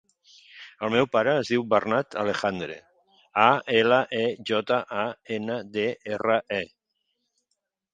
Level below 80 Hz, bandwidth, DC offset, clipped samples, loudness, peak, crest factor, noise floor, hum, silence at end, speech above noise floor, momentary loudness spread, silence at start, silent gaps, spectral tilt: -66 dBFS; 9.2 kHz; under 0.1%; under 0.1%; -25 LUFS; -2 dBFS; 24 dB; -79 dBFS; none; 1.3 s; 55 dB; 12 LU; 0.55 s; none; -5.5 dB/octave